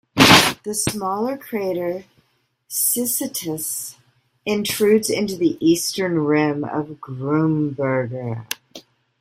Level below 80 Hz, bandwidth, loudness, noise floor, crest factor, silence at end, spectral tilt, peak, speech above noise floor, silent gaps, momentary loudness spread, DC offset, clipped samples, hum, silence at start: -52 dBFS; 16 kHz; -19 LUFS; -65 dBFS; 20 dB; 0.4 s; -3.5 dB/octave; 0 dBFS; 44 dB; none; 12 LU; under 0.1%; under 0.1%; none; 0.15 s